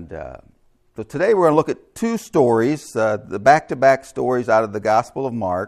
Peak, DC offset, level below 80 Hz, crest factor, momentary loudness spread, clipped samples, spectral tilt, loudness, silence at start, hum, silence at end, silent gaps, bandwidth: 0 dBFS; under 0.1%; -54 dBFS; 18 dB; 12 LU; under 0.1%; -6 dB/octave; -18 LUFS; 0 s; none; 0 s; none; 13.5 kHz